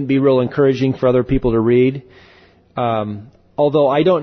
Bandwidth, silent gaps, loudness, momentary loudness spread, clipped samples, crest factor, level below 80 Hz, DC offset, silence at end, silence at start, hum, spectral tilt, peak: 6.4 kHz; none; -16 LUFS; 15 LU; under 0.1%; 12 dB; -38 dBFS; under 0.1%; 0 s; 0 s; none; -9 dB/octave; -4 dBFS